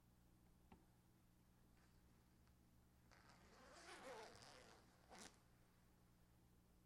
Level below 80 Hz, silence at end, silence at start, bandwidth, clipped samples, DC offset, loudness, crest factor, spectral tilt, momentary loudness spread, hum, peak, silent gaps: -80 dBFS; 0 s; 0 s; 16 kHz; under 0.1%; under 0.1%; -63 LUFS; 26 dB; -3.5 dB/octave; 10 LU; 60 Hz at -80 dBFS; -42 dBFS; none